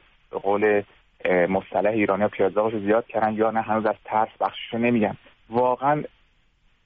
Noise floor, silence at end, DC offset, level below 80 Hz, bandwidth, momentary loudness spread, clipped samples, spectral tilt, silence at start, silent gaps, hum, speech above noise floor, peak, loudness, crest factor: -62 dBFS; 0.8 s; under 0.1%; -60 dBFS; 4.8 kHz; 7 LU; under 0.1%; -5 dB/octave; 0.35 s; none; none; 39 dB; -10 dBFS; -23 LUFS; 14 dB